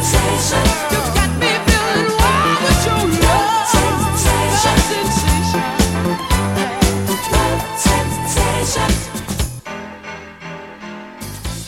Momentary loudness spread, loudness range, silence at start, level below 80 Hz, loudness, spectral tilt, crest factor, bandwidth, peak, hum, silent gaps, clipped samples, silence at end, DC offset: 17 LU; 5 LU; 0 s; -24 dBFS; -15 LUFS; -4 dB/octave; 16 dB; 16.5 kHz; 0 dBFS; none; none; under 0.1%; 0 s; under 0.1%